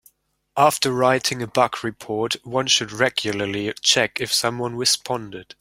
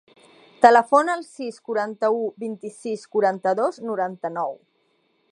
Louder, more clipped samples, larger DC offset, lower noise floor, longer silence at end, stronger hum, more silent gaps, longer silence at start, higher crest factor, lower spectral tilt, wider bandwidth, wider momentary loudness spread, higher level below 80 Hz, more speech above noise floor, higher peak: about the same, -20 LUFS vs -22 LUFS; neither; neither; second, -58 dBFS vs -67 dBFS; second, 0.15 s vs 0.75 s; neither; neither; about the same, 0.55 s vs 0.6 s; about the same, 20 dB vs 22 dB; second, -2.5 dB/octave vs -5 dB/octave; first, 16.5 kHz vs 11 kHz; second, 10 LU vs 17 LU; first, -60 dBFS vs -78 dBFS; second, 37 dB vs 45 dB; about the same, -2 dBFS vs 0 dBFS